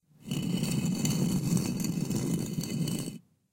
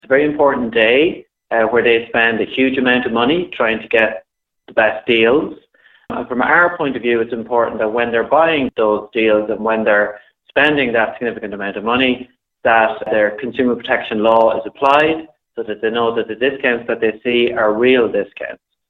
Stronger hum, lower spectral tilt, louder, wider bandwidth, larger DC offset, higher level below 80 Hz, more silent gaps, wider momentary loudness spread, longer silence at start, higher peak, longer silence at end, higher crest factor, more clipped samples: neither; second, -5.5 dB/octave vs -7 dB/octave; second, -31 LUFS vs -15 LUFS; first, 17 kHz vs 5.4 kHz; neither; about the same, -56 dBFS vs -52 dBFS; neither; about the same, 8 LU vs 10 LU; first, 0.25 s vs 0.1 s; second, -14 dBFS vs 0 dBFS; about the same, 0.35 s vs 0.35 s; about the same, 18 dB vs 16 dB; neither